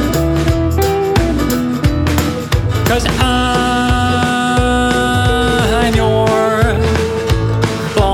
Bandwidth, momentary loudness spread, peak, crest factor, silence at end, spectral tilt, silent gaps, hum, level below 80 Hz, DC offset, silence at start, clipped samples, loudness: over 20 kHz; 3 LU; -2 dBFS; 12 dB; 0 s; -5.5 dB/octave; none; none; -22 dBFS; under 0.1%; 0 s; under 0.1%; -14 LUFS